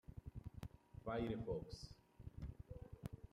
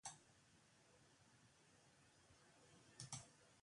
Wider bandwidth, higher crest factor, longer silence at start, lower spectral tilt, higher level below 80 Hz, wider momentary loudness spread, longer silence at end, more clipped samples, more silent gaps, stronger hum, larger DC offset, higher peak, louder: first, 15 kHz vs 11 kHz; second, 18 dB vs 28 dB; about the same, 0.1 s vs 0.05 s; first, -7.5 dB/octave vs -2.5 dB/octave; first, -60 dBFS vs -86 dBFS; about the same, 13 LU vs 14 LU; about the same, 0.05 s vs 0 s; neither; neither; neither; neither; first, -32 dBFS vs -36 dBFS; first, -51 LUFS vs -58 LUFS